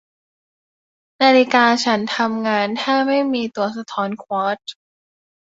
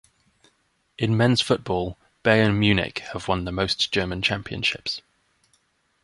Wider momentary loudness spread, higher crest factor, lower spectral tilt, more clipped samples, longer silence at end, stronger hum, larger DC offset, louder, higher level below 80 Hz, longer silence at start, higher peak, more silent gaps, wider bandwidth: about the same, 11 LU vs 10 LU; about the same, 18 dB vs 22 dB; second, -4 dB/octave vs -5.5 dB/octave; neither; second, 0.7 s vs 1.05 s; neither; neither; first, -18 LUFS vs -23 LUFS; second, -68 dBFS vs -46 dBFS; first, 1.2 s vs 1 s; about the same, -2 dBFS vs -2 dBFS; neither; second, 7.8 kHz vs 11.5 kHz